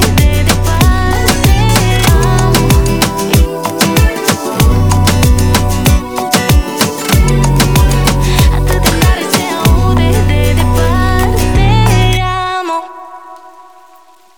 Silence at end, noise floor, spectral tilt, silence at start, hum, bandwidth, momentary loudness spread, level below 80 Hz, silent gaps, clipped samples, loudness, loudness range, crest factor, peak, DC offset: 0.9 s; -43 dBFS; -5 dB/octave; 0 s; none; over 20 kHz; 4 LU; -14 dBFS; none; under 0.1%; -11 LUFS; 2 LU; 10 dB; 0 dBFS; under 0.1%